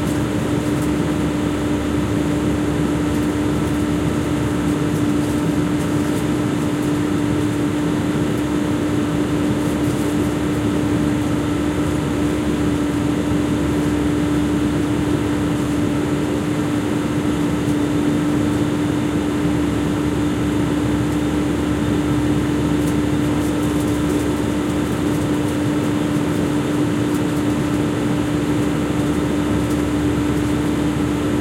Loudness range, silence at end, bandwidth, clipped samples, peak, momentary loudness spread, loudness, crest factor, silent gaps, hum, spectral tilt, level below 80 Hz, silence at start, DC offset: 1 LU; 0 s; 16 kHz; under 0.1%; -6 dBFS; 1 LU; -19 LUFS; 12 dB; none; none; -6.5 dB/octave; -34 dBFS; 0 s; under 0.1%